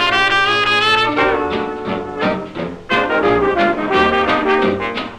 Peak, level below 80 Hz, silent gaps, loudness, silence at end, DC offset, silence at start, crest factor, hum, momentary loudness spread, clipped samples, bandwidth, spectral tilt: -2 dBFS; -42 dBFS; none; -15 LUFS; 0 s; under 0.1%; 0 s; 14 dB; none; 10 LU; under 0.1%; 12 kHz; -4.5 dB/octave